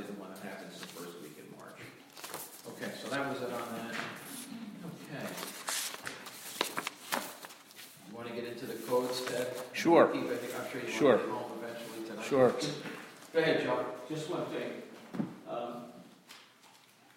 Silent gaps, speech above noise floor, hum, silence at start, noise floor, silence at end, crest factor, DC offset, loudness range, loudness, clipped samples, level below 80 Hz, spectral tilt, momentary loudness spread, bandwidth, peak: none; 30 dB; none; 0 s; -61 dBFS; 0.4 s; 24 dB; under 0.1%; 10 LU; -35 LUFS; under 0.1%; -78 dBFS; -4 dB/octave; 21 LU; 16.5 kHz; -12 dBFS